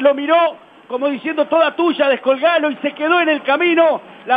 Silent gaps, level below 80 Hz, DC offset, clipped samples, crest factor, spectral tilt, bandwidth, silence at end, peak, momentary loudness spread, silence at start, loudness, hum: none; -76 dBFS; under 0.1%; under 0.1%; 14 dB; -6 dB/octave; 4.9 kHz; 0 s; 0 dBFS; 7 LU; 0 s; -16 LUFS; none